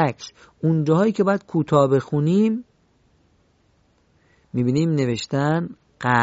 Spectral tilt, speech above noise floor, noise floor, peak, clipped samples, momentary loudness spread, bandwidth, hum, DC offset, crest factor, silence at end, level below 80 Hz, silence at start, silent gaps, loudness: -7.5 dB/octave; 41 dB; -61 dBFS; -2 dBFS; under 0.1%; 11 LU; 8 kHz; none; under 0.1%; 18 dB; 0 s; -58 dBFS; 0 s; none; -21 LUFS